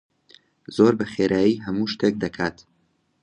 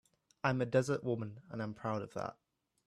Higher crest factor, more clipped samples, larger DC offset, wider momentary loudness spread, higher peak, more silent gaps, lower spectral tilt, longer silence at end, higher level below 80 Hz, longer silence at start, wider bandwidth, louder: about the same, 20 dB vs 20 dB; neither; neither; about the same, 9 LU vs 11 LU; first, -4 dBFS vs -18 dBFS; neither; about the same, -6.5 dB/octave vs -6.5 dB/octave; first, 0.7 s vs 0.55 s; first, -56 dBFS vs -72 dBFS; first, 0.7 s vs 0.45 s; second, 10.5 kHz vs 12.5 kHz; first, -22 LUFS vs -37 LUFS